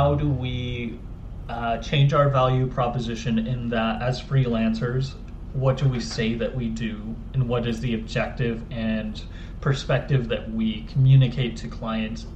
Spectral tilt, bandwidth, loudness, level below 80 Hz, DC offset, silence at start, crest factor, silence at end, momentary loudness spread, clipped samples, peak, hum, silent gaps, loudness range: -7.5 dB/octave; 8.2 kHz; -24 LUFS; -36 dBFS; under 0.1%; 0 s; 18 dB; 0 s; 13 LU; under 0.1%; -6 dBFS; none; none; 4 LU